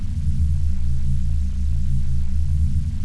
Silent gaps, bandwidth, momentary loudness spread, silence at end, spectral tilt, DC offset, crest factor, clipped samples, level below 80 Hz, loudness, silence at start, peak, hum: none; 1.7 kHz; 3 LU; 0 s; -8 dB/octave; under 0.1%; 8 dB; under 0.1%; -20 dBFS; -24 LUFS; 0 s; -10 dBFS; none